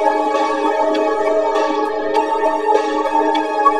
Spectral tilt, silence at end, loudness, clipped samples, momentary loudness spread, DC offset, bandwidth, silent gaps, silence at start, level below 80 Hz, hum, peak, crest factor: -3 dB/octave; 0 s; -17 LUFS; under 0.1%; 2 LU; 1%; 12 kHz; none; 0 s; -56 dBFS; none; 0 dBFS; 16 dB